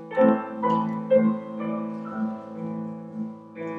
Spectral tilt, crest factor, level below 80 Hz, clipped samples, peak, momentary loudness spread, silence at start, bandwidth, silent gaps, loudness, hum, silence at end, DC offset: -9.5 dB/octave; 20 dB; -78 dBFS; under 0.1%; -6 dBFS; 14 LU; 0 s; 4.6 kHz; none; -26 LUFS; none; 0 s; under 0.1%